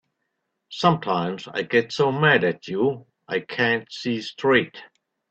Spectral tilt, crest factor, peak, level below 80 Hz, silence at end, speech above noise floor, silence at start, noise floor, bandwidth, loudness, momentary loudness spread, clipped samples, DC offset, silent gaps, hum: -6 dB/octave; 20 dB; -4 dBFS; -64 dBFS; 0.45 s; 55 dB; 0.7 s; -77 dBFS; 8.2 kHz; -22 LUFS; 11 LU; under 0.1%; under 0.1%; none; none